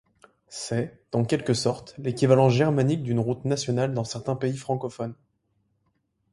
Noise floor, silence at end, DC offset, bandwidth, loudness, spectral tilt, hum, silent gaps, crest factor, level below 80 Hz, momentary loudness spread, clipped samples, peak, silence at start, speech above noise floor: -73 dBFS; 1.2 s; under 0.1%; 11.5 kHz; -25 LUFS; -6.5 dB/octave; none; none; 22 dB; -60 dBFS; 13 LU; under 0.1%; -4 dBFS; 0.5 s; 48 dB